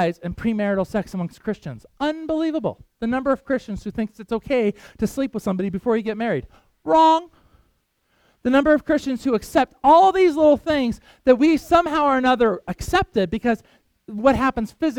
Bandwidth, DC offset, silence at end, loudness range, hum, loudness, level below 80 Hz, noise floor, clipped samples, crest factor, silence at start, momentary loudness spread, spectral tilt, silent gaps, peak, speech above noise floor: 17 kHz; under 0.1%; 0 s; 8 LU; none; -20 LUFS; -44 dBFS; -67 dBFS; under 0.1%; 18 dB; 0 s; 12 LU; -6 dB/octave; none; -2 dBFS; 47 dB